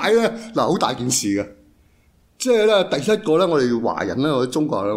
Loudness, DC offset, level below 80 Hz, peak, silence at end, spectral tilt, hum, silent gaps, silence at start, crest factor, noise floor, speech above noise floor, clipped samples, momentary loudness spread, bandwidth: -19 LUFS; under 0.1%; -56 dBFS; -4 dBFS; 0 s; -4 dB/octave; none; none; 0 s; 16 dB; -57 dBFS; 38 dB; under 0.1%; 6 LU; 16 kHz